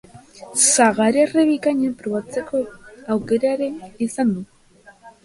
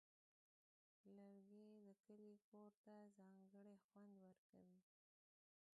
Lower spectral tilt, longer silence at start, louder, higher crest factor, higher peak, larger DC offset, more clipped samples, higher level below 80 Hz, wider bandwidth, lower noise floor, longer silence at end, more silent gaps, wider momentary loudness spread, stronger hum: second, -3.5 dB/octave vs -8 dB/octave; second, 0.15 s vs 1.05 s; first, -19 LUFS vs -68 LUFS; about the same, 18 dB vs 14 dB; first, -2 dBFS vs -56 dBFS; neither; neither; first, -58 dBFS vs under -90 dBFS; first, 11.5 kHz vs 7.4 kHz; second, -50 dBFS vs under -90 dBFS; second, 0.15 s vs 0.95 s; second, none vs 2.00-2.04 s, 2.44-2.52 s, 2.77-2.84 s, 3.84-3.89 s, 4.38-4.53 s; first, 12 LU vs 3 LU; neither